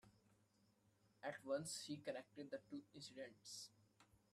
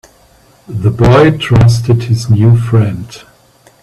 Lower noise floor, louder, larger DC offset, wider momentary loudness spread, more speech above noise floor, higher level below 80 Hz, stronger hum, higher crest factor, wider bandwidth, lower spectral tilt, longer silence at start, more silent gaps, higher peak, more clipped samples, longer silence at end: first, -79 dBFS vs -46 dBFS; second, -52 LUFS vs -10 LUFS; neither; second, 10 LU vs 13 LU; second, 27 dB vs 37 dB; second, -90 dBFS vs -30 dBFS; neither; first, 22 dB vs 10 dB; first, 14.5 kHz vs 11.5 kHz; second, -3.5 dB/octave vs -7.5 dB/octave; second, 0.05 s vs 0.7 s; neither; second, -34 dBFS vs 0 dBFS; neither; second, 0.15 s vs 0.65 s